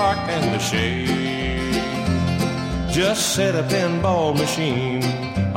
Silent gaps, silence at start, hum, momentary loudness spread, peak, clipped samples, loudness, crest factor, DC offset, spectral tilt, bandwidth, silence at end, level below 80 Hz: none; 0 s; none; 4 LU; -6 dBFS; under 0.1%; -21 LUFS; 14 dB; under 0.1%; -4.5 dB/octave; 16.5 kHz; 0 s; -36 dBFS